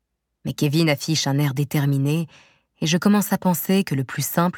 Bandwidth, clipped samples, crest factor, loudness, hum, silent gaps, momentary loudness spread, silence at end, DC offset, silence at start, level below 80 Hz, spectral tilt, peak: 19 kHz; under 0.1%; 16 dB; -21 LUFS; none; none; 8 LU; 0 s; under 0.1%; 0.45 s; -62 dBFS; -5.5 dB/octave; -6 dBFS